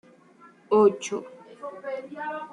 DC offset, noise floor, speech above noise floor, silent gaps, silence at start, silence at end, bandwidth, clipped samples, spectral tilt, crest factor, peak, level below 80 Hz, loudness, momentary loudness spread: under 0.1%; -54 dBFS; 30 dB; none; 0.45 s; 0 s; 10.5 kHz; under 0.1%; -5 dB/octave; 20 dB; -8 dBFS; -78 dBFS; -26 LUFS; 20 LU